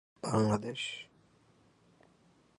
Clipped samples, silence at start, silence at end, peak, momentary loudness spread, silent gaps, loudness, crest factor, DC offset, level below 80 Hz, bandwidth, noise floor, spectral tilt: under 0.1%; 0.25 s; 1.55 s; -16 dBFS; 16 LU; none; -34 LUFS; 22 dB; under 0.1%; -68 dBFS; 11 kHz; -67 dBFS; -5.5 dB/octave